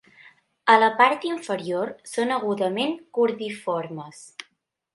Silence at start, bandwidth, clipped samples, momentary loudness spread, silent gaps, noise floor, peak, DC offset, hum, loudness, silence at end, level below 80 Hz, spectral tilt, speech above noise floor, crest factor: 0.65 s; 11.5 kHz; under 0.1%; 20 LU; none; -70 dBFS; -2 dBFS; under 0.1%; none; -23 LUFS; 0.55 s; -76 dBFS; -4.5 dB/octave; 47 dB; 22 dB